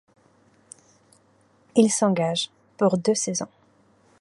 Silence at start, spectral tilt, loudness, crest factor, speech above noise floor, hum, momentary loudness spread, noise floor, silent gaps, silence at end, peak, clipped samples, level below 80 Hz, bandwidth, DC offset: 1.75 s; -4.5 dB/octave; -23 LUFS; 22 dB; 39 dB; none; 11 LU; -61 dBFS; none; 0.75 s; -4 dBFS; under 0.1%; -72 dBFS; 11.5 kHz; under 0.1%